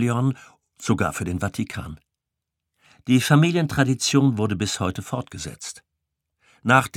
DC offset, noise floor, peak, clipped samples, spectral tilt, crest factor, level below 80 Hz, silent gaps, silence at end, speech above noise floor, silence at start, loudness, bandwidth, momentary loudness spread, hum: under 0.1%; -84 dBFS; -2 dBFS; under 0.1%; -5 dB/octave; 22 dB; -50 dBFS; none; 0 s; 62 dB; 0 s; -22 LUFS; 16.5 kHz; 18 LU; none